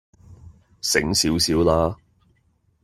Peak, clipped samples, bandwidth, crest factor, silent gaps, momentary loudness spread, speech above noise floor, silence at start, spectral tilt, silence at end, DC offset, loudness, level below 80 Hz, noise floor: -2 dBFS; under 0.1%; 16 kHz; 22 dB; none; 9 LU; 44 dB; 0.3 s; -3.5 dB/octave; 0.9 s; under 0.1%; -20 LUFS; -44 dBFS; -64 dBFS